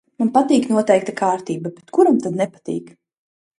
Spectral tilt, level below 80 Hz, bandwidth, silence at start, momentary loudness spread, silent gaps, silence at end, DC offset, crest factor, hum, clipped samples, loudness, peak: -6 dB/octave; -66 dBFS; 11.5 kHz; 0.2 s; 12 LU; none; 0.7 s; under 0.1%; 18 dB; none; under 0.1%; -18 LUFS; 0 dBFS